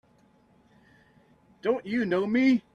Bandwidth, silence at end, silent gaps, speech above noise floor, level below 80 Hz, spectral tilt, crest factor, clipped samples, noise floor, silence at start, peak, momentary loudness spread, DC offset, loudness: 7 kHz; 0.15 s; none; 37 dB; -70 dBFS; -7 dB/octave; 16 dB; under 0.1%; -62 dBFS; 1.65 s; -12 dBFS; 7 LU; under 0.1%; -26 LUFS